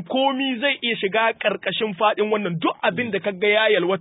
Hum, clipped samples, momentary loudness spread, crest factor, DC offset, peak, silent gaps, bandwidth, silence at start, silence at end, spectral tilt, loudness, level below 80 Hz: none; under 0.1%; 6 LU; 16 dB; under 0.1%; -6 dBFS; none; 4 kHz; 0 s; 0 s; -9.5 dB/octave; -21 LUFS; -70 dBFS